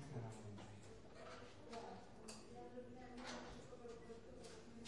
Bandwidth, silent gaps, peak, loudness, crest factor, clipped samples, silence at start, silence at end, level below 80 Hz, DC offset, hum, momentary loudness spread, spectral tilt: 11.5 kHz; none; -38 dBFS; -56 LUFS; 16 dB; under 0.1%; 0 s; 0 s; -70 dBFS; under 0.1%; none; 6 LU; -5 dB/octave